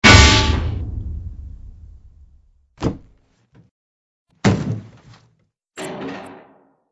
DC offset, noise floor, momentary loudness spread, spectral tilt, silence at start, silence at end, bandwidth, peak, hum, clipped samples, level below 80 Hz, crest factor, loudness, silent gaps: under 0.1%; -63 dBFS; 27 LU; -4 dB/octave; 0 s; 0.55 s; 11 kHz; 0 dBFS; none; under 0.1%; -28 dBFS; 20 dB; -17 LUFS; 3.71-4.26 s